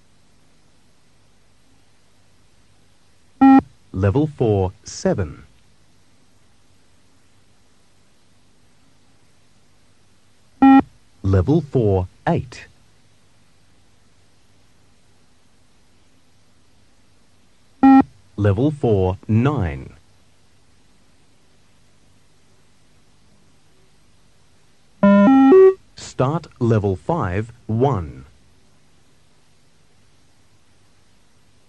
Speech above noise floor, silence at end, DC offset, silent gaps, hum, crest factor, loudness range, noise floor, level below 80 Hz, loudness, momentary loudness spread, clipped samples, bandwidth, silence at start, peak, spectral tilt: 39 dB; 3.45 s; 0.3%; none; none; 18 dB; 12 LU; -58 dBFS; -48 dBFS; -17 LUFS; 16 LU; under 0.1%; 8.6 kHz; 3.4 s; -2 dBFS; -8.5 dB/octave